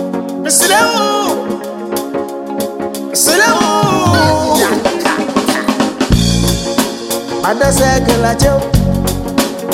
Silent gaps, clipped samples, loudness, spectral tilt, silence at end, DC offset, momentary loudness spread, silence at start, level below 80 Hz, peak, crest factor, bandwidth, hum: none; under 0.1%; -13 LUFS; -4 dB/octave; 0 s; under 0.1%; 10 LU; 0 s; -26 dBFS; 0 dBFS; 12 dB; 17 kHz; none